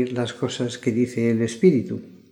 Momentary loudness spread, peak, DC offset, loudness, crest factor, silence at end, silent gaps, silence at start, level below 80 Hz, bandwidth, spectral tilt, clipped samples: 8 LU; -4 dBFS; under 0.1%; -22 LUFS; 18 dB; 0.15 s; none; 0 s; -64 dBFS; 11.5 kHz; -6.5 dB/octave; under 0.1%